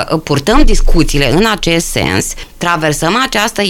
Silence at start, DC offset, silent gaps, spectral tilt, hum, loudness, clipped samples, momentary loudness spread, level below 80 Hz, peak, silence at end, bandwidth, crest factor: 0 s; under 0.1%; none; -4 dB/octave; none; -12 LUFS; under 0.1%; 4 LU; -14 dBFS; 0 dBFS; 0 s; 15.5 kHz; 10 dB